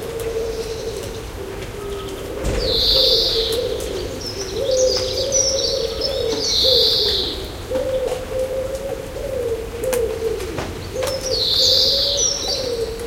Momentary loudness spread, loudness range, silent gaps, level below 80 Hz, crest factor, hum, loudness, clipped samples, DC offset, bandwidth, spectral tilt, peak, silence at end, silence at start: 15 LU; 7 LU; none; -34 dBFS; 18 dB; none; -19 LUFS; under 0.1%; under 0.1%; 17 kHz; -2 dB/octave; -4 dBFS; 0 s; 0 s